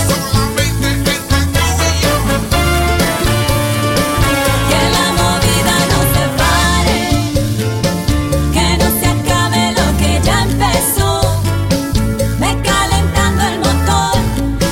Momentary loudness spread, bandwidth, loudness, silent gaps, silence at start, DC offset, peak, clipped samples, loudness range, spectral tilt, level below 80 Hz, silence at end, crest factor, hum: 3 LU; 16.5 kHz; -13 LUFS; none; 0 s; under 0.1%; 0 dBFS; under 0.1%; 2 LU; -4.5 dB/octave; -20 dBFS; 0 s; 12 dB; none